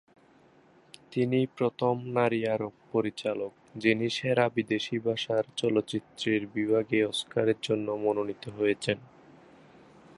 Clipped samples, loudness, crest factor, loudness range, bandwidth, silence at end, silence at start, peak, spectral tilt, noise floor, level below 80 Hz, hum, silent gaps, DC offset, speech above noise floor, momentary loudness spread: under 0.1%; -29 LUFS; 20 dB; 2 LU; 11.5 kHz; 1.1 s; 1.1 s; -10 dBFS; -5.5 dB/octave; -60 dBFS; -68 dBFS; none; none; under 0.1%; 31 dB; 6 LU